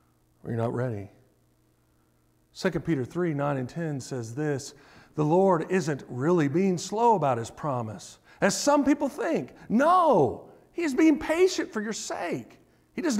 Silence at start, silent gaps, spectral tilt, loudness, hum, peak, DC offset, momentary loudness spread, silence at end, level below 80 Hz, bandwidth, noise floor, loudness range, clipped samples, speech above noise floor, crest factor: 0.45 s; none; -5.5 dB/octave; -26 LUFS; none; -10 dBFS; under 0.1%; 13 LU; 0 s; -62 dBFS; 15.5 kHz; -66 dBFS; 8 LU; under 0.1%; 40 dB; 16 dB